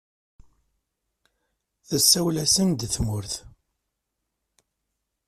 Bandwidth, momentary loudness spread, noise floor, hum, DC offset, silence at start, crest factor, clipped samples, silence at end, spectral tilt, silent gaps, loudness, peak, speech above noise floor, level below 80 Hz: 15.5 kHz; 14 LU; -81 dBFS; none; under 0.1%; 1.9 s; 24 dB; under 0.1%; 1.8 s; -3.5 dB/octave; none; -21 LUFS; -4 dBFS; 58 dB; -48 dBFS